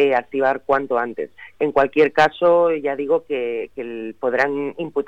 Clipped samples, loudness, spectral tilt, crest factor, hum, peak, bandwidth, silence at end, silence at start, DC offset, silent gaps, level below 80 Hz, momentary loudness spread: under 0.1%; -20 LUFS; -6 dB/octave; 14 dB; none; -4 dBFS; 8 kHz; 0 s; 0 s; 0.3%; none; -56 dBFS; 13 LU